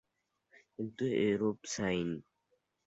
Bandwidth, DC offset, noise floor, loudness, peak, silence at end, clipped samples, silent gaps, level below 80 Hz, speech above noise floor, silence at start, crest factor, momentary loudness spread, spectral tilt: 8.2 kHz; under 0.1%; -81 dBFS; -35 LUFS; -20 dBFS; 0.65 s; under 0.1%; none; -66 dBFS; 47 dB; 0.8 s; 18 dB; 13 LU; -5 dB/octave